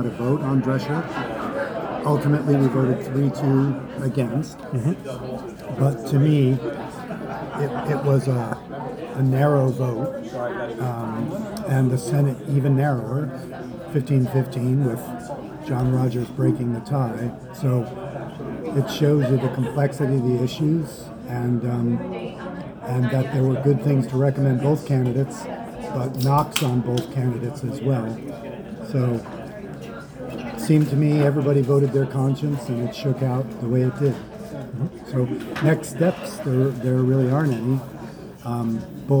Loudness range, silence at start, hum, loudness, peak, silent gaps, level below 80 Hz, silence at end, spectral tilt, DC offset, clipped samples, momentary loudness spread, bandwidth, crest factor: 3 LU; 0 s; none; -23 LUFS; 0 dBFS; none; -52 dBFS; 0 s; -8 dB/octave; under 0.1%; under 0.1%; 13 LU; over 20 kHz; 22 dB